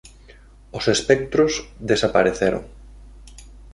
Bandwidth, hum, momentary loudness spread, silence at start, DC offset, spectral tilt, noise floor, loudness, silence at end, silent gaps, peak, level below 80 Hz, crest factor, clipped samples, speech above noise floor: 11.5 kHz; none; 10 LU; 0.05 s; under 0.1%; -4 dB/octave; -46 dBFS; -20 LUFS; 0 s; none; -2 dBFS; -42 dBFS; 20 dB; under 0.1%; 27 dB